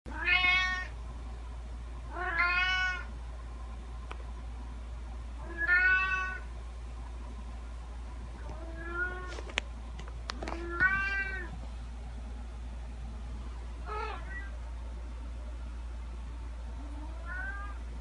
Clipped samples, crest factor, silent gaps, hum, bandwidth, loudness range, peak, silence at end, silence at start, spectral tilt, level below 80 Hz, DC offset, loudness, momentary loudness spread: under 0.1%; 30 dB; none; none; 10.5 kHz; 10 LU; -6 dBFS; 0 s; 0.05 s; -4 dB/octave; -40 dBFS; under 0.1%; -34 LUFS; 17 LU